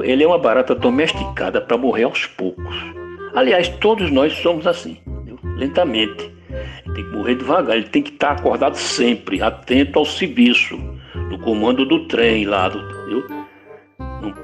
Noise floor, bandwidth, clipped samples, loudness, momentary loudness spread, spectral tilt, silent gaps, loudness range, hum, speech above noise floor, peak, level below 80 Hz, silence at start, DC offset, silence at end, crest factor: -43 dBFS; 11.5 kHz; under 0.1%; -17 LUFS; 16 LU; -5 dB/octave; none; 4 LU; none; 27 dB; -2 dBFS; -38 dBFS; 0 s; under 0.1%; 0 s; 16 dB